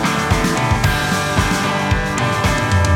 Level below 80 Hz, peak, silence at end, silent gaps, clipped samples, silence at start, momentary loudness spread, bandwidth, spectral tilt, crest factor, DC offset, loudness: -28 dBFS; -2 dBFS; 0 s; none; under 0.1%; 0 s; 2 LU; 18 kHz; -4.5 dB/octave; 14 dB; under 0.1%; -17 LUFS